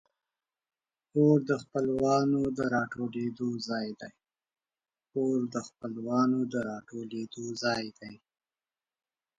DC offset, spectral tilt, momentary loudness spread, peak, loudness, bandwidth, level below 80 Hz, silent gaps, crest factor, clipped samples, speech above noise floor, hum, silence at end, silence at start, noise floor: under 0.1%; -6.5 dB/octave; 14 LU; -14 dBFS; -30 LUFS; 8.8 kHz; -68 dBFS; none; 18 dB; under 0.1%; over 60 dB; none; 1.2 s; 1.15 s; under -90 dBFS